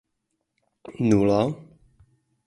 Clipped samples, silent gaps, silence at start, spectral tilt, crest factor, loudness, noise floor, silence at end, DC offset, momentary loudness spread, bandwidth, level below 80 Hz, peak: under 0.1%; none; 0.9 s; -7.5 dB/octave; 20 dB; -22 LUFS; -78 dBFS; 0.85 s; under 0.1%; 21 LU; 11.5 kHz; -54 dBFS; -6 dBFS